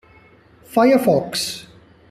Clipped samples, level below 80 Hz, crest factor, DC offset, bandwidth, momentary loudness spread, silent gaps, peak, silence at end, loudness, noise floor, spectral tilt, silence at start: under 0.1%; -58 dBFS; 16 dB; under 0.1%; 14.5 kHz; 12 LU; none; -4 dBFS; 0.5 s; -18 LUFS; -50 dBFS; -4.5 dB/octave; 0.7 s